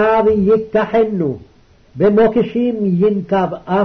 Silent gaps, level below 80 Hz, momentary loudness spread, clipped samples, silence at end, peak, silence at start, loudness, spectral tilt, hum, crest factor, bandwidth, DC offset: none; -44 dBFS; 6 LU; under 0.1%; 0 s; -4 dBFS; 0 s; -15 LUFS; -9.5 dB/octave; none; 10 dB; 6 kHz; under 0.1%